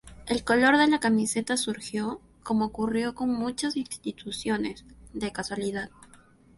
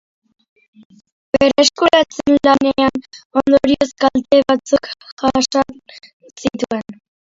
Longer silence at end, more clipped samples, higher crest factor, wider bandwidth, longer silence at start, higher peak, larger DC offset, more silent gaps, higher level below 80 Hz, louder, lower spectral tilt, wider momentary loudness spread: about the same, 0.5 s vs 0.45 s; neither; about the same, 20 dB vs 16 dB; first, 11.5 kHz vs 7.8 kHz; second, 0.05 s vs 1.35 s; second, -8 dBFS vs 0 dBFS; neither; second, none vs 3.25-3.30 s, 5.12-5.17 s, 6.13-6.20 s; second, -56 dBFS vs -48 dBFS; second, -27 LUFS vs -15 LUFS; about the same, -3.5 dB/octave vs -3.5 dB/octave; first, 14 LU vs 11 LU